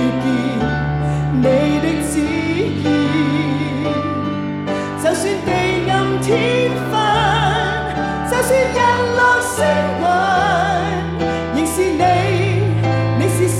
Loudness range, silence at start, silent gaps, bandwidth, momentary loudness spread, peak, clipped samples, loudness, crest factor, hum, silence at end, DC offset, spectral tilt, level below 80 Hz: 3 LU; 0 s; none; 16 kHz; 6 LU; -2 dBFS; under 0.1%; -17 LUFS; 14 dB; none; 0 s; under 0.1%; -5.5 dB/octave; -38 dBFS